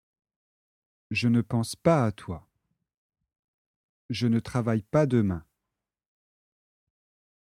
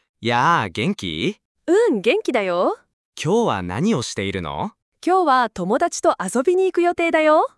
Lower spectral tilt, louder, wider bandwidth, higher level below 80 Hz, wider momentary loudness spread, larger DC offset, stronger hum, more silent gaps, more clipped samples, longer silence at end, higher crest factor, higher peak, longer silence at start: first, -7 dB/octave vs -5 dB/octave; second, -26 LUFS vs -20 LUFS; first, 14 kHz vs 12 kHz; about the same, -58 dBFS vs -56 dBFS; first, 14 LU vs 9 LU; neither; neither; first, 2.97-3.09 s, 3.39-4.09 s vs 1.45-1.55 s, 2.93-3.13 s, 4.82-4.92 s; neither; first, 2.05 s vs 0.1 s; first, 22 dB vs 16 dB; second, -8 dBFS vs -4 dBFS; first, 1.1 s vs 0.2 s